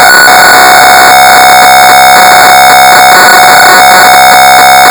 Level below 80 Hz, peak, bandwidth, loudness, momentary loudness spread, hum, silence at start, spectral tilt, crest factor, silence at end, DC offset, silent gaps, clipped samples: -36 dBFS; 0 dBFS; over 20 kHz; 1 LUFS; 0 LU; none; 0 s; -0.5 dB/octave; 0 dB; 0 s; 0.4%; none; 50%